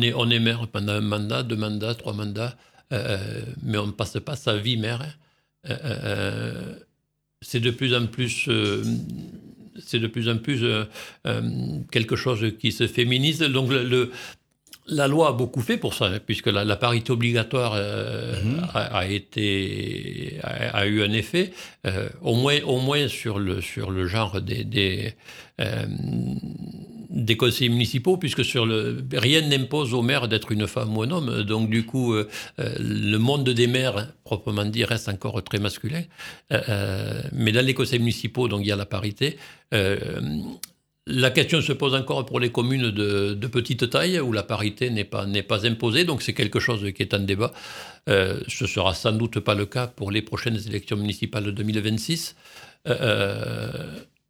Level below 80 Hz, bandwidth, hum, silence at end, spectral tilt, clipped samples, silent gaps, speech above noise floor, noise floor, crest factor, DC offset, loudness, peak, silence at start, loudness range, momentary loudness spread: -54 dBFS; 16.5 kHz; none; 0.25 s; -5.5 dB/octave; under 0.1%; none; 50 dB; -75 dBFS; 24 dB; under 0.1%; -24 LUFS; -2 dBFS; 0 s; 5 LU; 11 LU